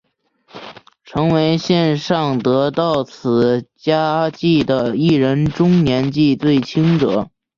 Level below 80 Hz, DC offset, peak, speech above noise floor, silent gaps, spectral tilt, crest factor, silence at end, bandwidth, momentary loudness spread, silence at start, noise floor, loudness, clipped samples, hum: -48 dBFS; under 0.1%; -2 dBFS; 42 dB; none; -7.5 dB/octave; 14 dB; 0.3 s; 7.2 kHz; 6 LU; 0.55 s; -57 dBFS; -16 LUFS; under 0.1%; none